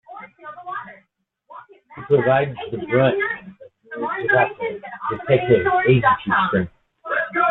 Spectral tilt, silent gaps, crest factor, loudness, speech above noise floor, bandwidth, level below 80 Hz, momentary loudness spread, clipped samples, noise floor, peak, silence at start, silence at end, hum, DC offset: -10 dB/octave; none; 18 dB; -19 LUFS; 48 dB; 4.1 kHz; -54 dBFS; 20 LU; under 0.1%; -66 dBFS; -4 dBFS; 0.1 s; 0 s; none; under 0.1%